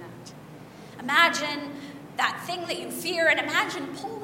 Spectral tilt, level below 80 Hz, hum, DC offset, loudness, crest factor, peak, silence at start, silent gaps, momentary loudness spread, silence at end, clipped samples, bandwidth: -2.5 dB/octave; -68 dBFS; none; under 0.1%; -25 LUFS; 22 dB; -6 dBFS; 0 s; none; 24 LU; 0 s; under 0.1%; 16.5 kHz